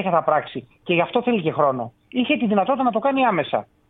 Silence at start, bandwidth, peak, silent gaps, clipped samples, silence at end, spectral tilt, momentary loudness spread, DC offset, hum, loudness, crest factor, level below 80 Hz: 0 s; 4.1 kHz; -4 dBFS; none; under 0.1%; 0.25 s; -9.5 dB/octave; 8 LU; under 0.1%; none; -21 LUFS; 18 dB; -62 dBFS